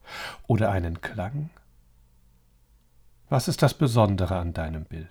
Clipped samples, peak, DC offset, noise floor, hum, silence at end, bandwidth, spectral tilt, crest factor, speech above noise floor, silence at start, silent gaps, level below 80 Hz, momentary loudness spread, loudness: under 0.1%; -6 dBFS; under 0.1%; -60 dBFS; none; 0.05 s; 19.5 kHz; -6.5 dB/octave; 20 dB; 35 dB; 0.05 s; none; -44 dBFS; 15 LU; -26 LUFS